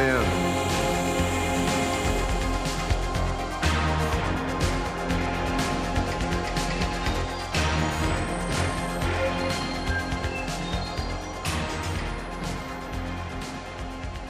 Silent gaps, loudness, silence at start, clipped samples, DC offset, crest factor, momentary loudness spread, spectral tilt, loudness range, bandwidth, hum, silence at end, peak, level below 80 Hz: none; -27 LUFS; 0 s; under 0.1%; under 0.1%; 16 dB; 8 LU; -4.5 dB/octave; 5 LU; 15.5 kHz; none; 0 s; -10 dBFS; -34 dBFS